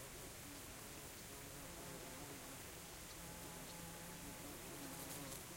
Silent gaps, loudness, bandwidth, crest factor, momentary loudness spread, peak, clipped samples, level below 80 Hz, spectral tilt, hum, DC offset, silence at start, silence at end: none; -52 LUFS; 16.5 kHz; 16 dB; 3 LU; -36 dBFS; under 0.1%; -66 dBFS; -3 dB/octave; none; under 0.1%; 0 s; 0 s